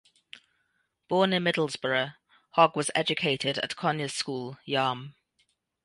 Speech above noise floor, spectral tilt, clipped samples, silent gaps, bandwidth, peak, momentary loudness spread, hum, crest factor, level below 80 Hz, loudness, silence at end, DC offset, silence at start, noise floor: 48 dB; -4 dB/octave; under 0.1%; none; 11.5 kHz; -6 dBFS; 10 LU; none; 22 dB; -74 dBFS; -27 LUFS; 0.75 s; under 0.1%; 1.1 s; -75 dBFS